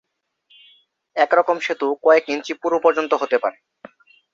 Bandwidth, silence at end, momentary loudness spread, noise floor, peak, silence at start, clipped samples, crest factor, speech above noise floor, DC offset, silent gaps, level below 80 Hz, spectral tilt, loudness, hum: 7.6 kHz; 0.8 s; 9 LU; -62 dBFS; -2 dBFS; 1.15 s; under 0.1%; 18 dB; 43 dB; under 0.1%; none; -70 dBFS; -3.5 dB/octave; -19 LUFS; none